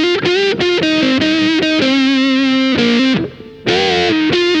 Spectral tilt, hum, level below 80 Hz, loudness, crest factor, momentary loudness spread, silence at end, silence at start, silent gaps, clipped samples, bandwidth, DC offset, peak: -4.5 dB/octave; none; -48 dBFS; -13 LUFS; 12 dB; 3 LU; 0 s; 0 s; none; under 0.1%; 8.8 kHz; under 0.1%; 0 dBFS